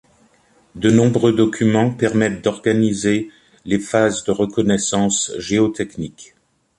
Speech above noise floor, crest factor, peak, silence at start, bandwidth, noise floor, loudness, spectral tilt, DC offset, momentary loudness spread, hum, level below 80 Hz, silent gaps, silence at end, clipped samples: 38 dB; 16 dB; -2 dBFS; 0.75 s; 11.5 kHz; -56 dBFS; -18 LUFS; -5 dB/octave; under 0.1%; 9 LU; none; -50 dBFS; none; 0.55 s; under 0.1%